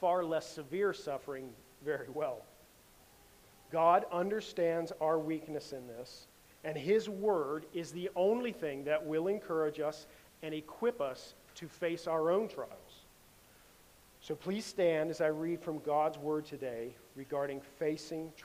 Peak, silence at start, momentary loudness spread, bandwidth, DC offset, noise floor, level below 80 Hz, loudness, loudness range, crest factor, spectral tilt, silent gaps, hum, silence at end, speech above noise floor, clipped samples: -14 dBFS; 0 s; 16 LU; 15.5 kHz; under 0.1%; -62 dBFS; -72 dBFS; -36 LUFS; 4 LU; 22 dB; -5.5 dB/octave; none; none; 0 s; 27 dB; under 0.1%